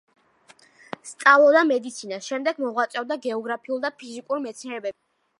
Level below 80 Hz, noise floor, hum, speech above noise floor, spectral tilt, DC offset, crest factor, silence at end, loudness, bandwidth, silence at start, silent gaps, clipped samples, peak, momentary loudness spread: -84 dBFS; -56 dBFS; none; 33 dB; -3 dB/octave; under 0.1%; 22 dB; 0.5 s; -23 LUFS; 11.5 kHz; 1.05 s; none; under 0.1%; -2 dBFS; 19 LU